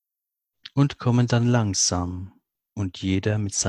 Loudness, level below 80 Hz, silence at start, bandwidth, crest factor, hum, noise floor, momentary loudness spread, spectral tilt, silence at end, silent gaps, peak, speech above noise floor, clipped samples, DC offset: -23 LUFS; -44 dBFS; 0.75 s; 11.5 kHz; 18 dB; none; -85 dBFS; 13 LU; -4.5 dB/octave; 0 s; none; -6 dBFS; 63 dB; under 0.1%; under 0.1%